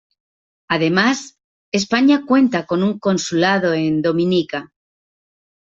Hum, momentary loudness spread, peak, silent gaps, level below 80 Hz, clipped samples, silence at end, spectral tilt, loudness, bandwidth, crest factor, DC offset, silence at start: none; 8 LU; -2 dBFS; 1.44-1.72 s; -60 dBFS; under 0.1%; 1 s; -5 dB/octave; -17 LUFS; 7.8 kHz; 16 dB; under 0.1%; 0.7 s